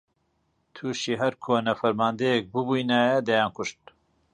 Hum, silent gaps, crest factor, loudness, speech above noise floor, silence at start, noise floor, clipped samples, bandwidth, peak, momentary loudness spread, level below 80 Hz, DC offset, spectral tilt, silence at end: none; none; 16 dB; -25 LUFS; 47 dB; 0.75 s; -72 dBFS; under 0.1%; 10 kHz; -10 dBFS; 11 LU; -66 dBFS; under 0.1%; -5 dB/octave; 0.6 s